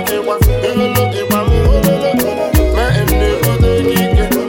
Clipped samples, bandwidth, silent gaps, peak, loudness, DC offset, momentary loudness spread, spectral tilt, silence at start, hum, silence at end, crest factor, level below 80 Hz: under 0.1%; 17.5 kHz; none; -2 dBFS; -13 LUFS; under 0.1%; 3 LU; -6 dB/octave; 0 s; none; 0 s; 10 dB; -18 dBFS